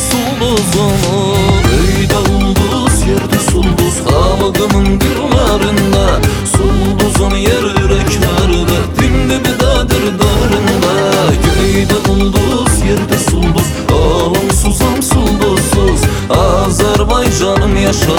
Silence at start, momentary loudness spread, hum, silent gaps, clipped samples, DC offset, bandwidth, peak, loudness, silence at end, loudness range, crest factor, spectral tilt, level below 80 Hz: 0 s; 2 LU; none; none; under 0.1%; 0.2%; over 20 kHz; 0 dBFS; -11 LUFS; 0 s; 1 LU; 10 dB; -5 dB/octave; -18 dBFS